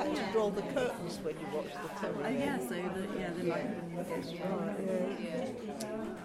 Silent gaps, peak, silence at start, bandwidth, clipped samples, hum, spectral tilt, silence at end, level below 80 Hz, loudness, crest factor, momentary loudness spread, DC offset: none; -20 dBFS; 0 s; 16 kHz; under 0.1%; none; -6 dB/octave; 0 s; -64 dBFS; -36 LUFS; 16 dB; 7 LU; under 0.1%